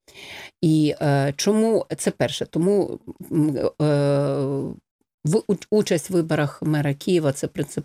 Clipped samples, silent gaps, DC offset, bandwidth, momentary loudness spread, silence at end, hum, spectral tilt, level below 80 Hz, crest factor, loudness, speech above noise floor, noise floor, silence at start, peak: under 0.1%; 4.91-4.99 s, 5.14-5.18 s; under 0.1%; 15.5 kHz; 9 LU; 0 s; none; -6 dB/octave; -58 dBFS; 14 dB; -22 LUFS; 19 dB; -41 dBFS; 0.15 s; -8 dBFS